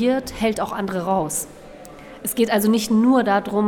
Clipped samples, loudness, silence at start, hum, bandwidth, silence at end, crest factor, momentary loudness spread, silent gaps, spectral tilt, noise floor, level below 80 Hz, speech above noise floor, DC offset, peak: under 0.1%; -20 LUFS; 0 s; none; 19.5 kHz; 0 s; 14 dB; 22 LU; none; -4.5 dB/octave; -40 dBFS; -48 dBFS; 21 dB; under 0.1%; -6 dBFS